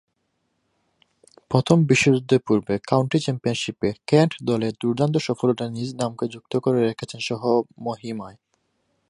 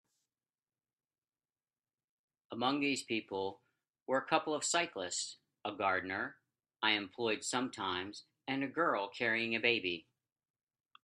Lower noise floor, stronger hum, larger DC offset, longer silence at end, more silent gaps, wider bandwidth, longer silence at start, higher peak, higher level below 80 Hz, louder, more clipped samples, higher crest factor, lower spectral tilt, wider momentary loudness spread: second, -73 dBFS vs under -90 dBFS; neither; neither; second, 0.8 s vs 1 s; second, none vs 4.02-4.06 s; second, 11.5 kHz vs 13 kHz; second, 1.5 s vs 2.5 s; first, -2 dBFS vs -14 dBFS; first, -58 dBFS vs -84 dBFS; first, -22 LUFS vs -36 LUFS; neither; about the same, 22 dB vs 24 dB; first, -6 dB/octave vs -2.5 dB/octave; about the same, 12 LU vs 12 LU